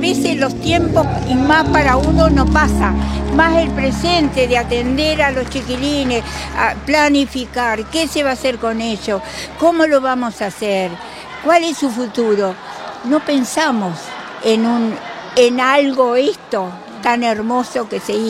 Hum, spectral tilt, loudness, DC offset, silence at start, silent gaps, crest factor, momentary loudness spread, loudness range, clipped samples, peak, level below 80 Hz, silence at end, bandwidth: none; -5 dB/octave; -15 LUFS; under 0.1%; 0 s; none; 16 dB; 9 LU; 4 LU; under 0.1%; 0 dBFS; -28 dBFS; 0 s; 15.5 kHz